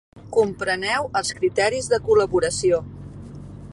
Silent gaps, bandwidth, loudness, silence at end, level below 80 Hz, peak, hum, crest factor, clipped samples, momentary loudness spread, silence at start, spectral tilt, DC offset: none; 11.5 kHz; -21 LUFS; 0 s; -46 dBFS; -6 dBFS; none; 16 dB; under 0.1%; 20 LU; 0.15 s; -4 dB/octave; under 0.1%